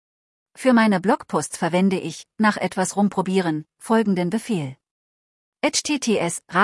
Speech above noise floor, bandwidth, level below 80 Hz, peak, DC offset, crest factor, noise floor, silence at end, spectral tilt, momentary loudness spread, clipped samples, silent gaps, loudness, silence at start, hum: over 69 dB; 12 kHz; -66 dBFS; -4 dBFS; under 0.1%; 18 dB; under -90 dBFS; 0 s; -4.5 dB/octave; 8 LU; under 0.1%; 4.91-5.52 s; -21 LUFS; 0.6 s; none